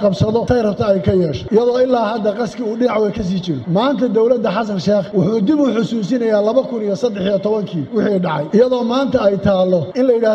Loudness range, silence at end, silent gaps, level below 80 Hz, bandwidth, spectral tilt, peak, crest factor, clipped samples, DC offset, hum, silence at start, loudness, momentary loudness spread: 1 LU; 0 s; none; -44 dBFS; 8.4 kHz; -7.5 dB/octave; -2 dBFS; 14 dB; under 0.1%; under 0.1%; none; 0 s; -16 LUFS; 5 LU